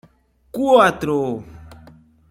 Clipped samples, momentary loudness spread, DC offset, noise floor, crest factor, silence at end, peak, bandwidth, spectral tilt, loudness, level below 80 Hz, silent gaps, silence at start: under 0.1%; 17 LU; under 0.1%; -56 dBFS; 18 dB; 0.55 s; -2 dBFS; 16 kHz; -5.5 dB/octave; -17 LUFS; -50 dBFS; none; 0.55 s